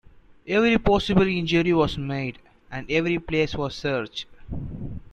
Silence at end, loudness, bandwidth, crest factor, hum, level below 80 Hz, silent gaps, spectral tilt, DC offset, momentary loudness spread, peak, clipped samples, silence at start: 0.1 s; -23 LUFS; 9.6 kHz; 20 dB; none; -40 dBFS; none; -6.5 dB/octave; under 0.1%; 16 LU; -4 dBFS; under 0.1%; 0.45 s